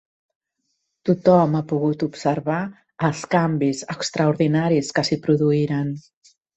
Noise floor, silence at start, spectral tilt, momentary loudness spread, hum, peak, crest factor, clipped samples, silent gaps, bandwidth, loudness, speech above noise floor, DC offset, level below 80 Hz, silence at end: -75 dBFS; 1.05 s; -6.5 dB/octave; 9 LU; none; -2 dBFS; 18 dB; under 0.1%; none; 8.4 kHz; -21 LUFS; 55 dB; under 0.1%; -60 dBFS; 0.55 s